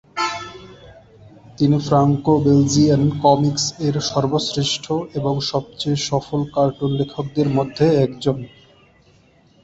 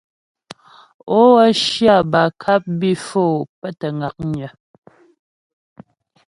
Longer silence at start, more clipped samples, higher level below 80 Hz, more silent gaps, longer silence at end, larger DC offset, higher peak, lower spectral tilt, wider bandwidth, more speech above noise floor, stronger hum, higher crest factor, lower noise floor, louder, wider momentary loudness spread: second, 0.15 s vs 1.05 s; neither; first, -48 dBFS vs -56 dBFS; second, none vs 3.49-3.62 s; second, 1.15 s vs 1.8 s; neither; about the same, -2 dBFS vs 0 dBFS; about the same, -6 dB/octave vs -5.5 dB/octave; second, 8 kHz vs 11.5 kHz; first, 36 dB vs 30 dB; neither; about the same, 18 dB vs 18 dB; first, -53 dBFS vs -46 dBFS; second, -19 LUFS vs -16 LUFS; second, 8 LU vs 14 LU